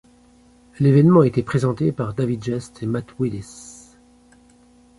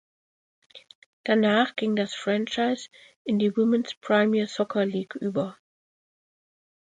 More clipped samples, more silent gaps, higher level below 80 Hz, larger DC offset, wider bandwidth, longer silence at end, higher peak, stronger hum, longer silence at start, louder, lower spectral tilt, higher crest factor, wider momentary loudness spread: neither; second, none vs 0.95-1.24 s, 3.16-3.25 s, 3.97-4.01 s; first, -52 dBFS vs -74 dBFS; neither; first, 11.5 kHz vs 9.2 kHz; second, 1.25 s vs 1.4 s; first, -2 dBFS vs -8 dBFS; neither; about the same, 0.8 s vs 0.75 s; first, -20 LUFS vs -25 LUFS; first, -8.5 dB/octave vs -5.5 dB/octave; about the same, 18 dB vs 18 dB; first, 19 LU vs 10 LU